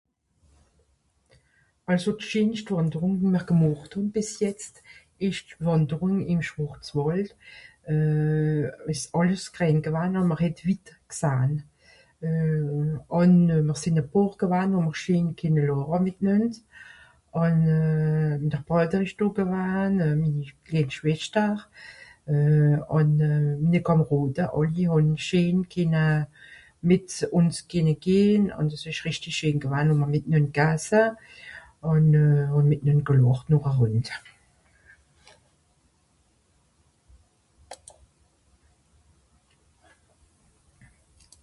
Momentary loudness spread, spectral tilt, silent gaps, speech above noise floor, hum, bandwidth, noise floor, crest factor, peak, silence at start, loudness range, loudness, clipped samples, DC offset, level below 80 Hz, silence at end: 9 LU; -7.5 dB/octave; none; 44 dB; none; 11.5 kHz; -67 dBFS; 16 dB; -8 dBFS; 1.9 s; 5 LU; -24 LUFS; under 0.1%; under 0.1%; -54 dBFS; 3.7 s